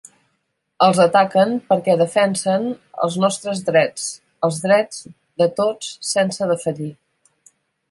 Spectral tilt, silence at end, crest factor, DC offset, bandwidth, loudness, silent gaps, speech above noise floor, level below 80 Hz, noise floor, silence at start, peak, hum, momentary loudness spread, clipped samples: -4.5 dB/octave; 1 s; 18 dB; under 0.1%; 11.5 kHz; -18 LUFS; none; 53 dB; -66 dBFS; -71 dBFS; 0.8 s; -2 dBFS; none; 13 LU; under 0.1%